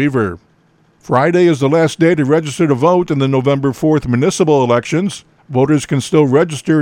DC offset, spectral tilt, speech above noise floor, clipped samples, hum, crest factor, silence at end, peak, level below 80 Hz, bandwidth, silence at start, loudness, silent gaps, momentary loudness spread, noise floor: under 0.1%; -6.5 dB/octave; 41 dB; under 0.1%; none; 12 dB; 0 s; 0 dBFS; -46 dBFS; 13.5 kHz; 0 s; -14 LUFS; none; 7 LU; -53 dBFS